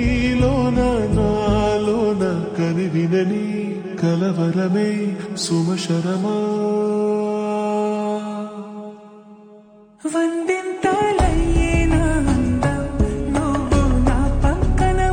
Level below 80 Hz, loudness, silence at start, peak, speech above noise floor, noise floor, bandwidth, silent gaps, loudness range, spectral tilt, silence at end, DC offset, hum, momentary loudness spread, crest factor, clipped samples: -26 dBFS; -20 LUFS; 0 s; -6 dBFS; 27 dB; -46 dBFS; 10 kHz; none; 5 LU; -6.5 dB/octave; 0 s; under 0.1%; none; 7 LU; 14 dB; under 0.1%